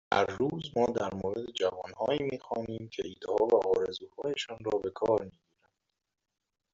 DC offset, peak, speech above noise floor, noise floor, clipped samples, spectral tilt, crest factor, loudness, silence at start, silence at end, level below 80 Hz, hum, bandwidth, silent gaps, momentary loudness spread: under 0.1%; -10 dBFS; 51 dB; -83 dBFS; under 0.1%; -4 dB/octave; 22 dB; -32 LUFS; 0.1 s; 1.45 s; -64 dBFS; none; 7.6 kHz; none; 11 LU